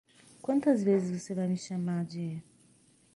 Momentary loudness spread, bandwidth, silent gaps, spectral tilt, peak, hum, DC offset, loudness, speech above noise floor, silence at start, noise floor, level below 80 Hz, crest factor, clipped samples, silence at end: 13 LU; 11.5 kHz; none; -7.5 dB/octave; -14 dBFS; none; under 0.1%; -31 LUFS; 34 dB; 0.45 s; -64 dBFS; -74 dBFS; 18 dB; under 0.1%; 0.75 s